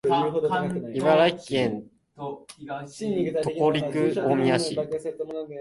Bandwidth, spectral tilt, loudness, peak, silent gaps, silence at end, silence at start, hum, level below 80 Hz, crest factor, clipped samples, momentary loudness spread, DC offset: 11.5 kHz; -6 dB/octave; -25 LUFS; -8 dBFS; none; 0 s; 0.05 s; none; -62 dBFS; 16 dB; under 0.1%; 15 LU; under 0.1%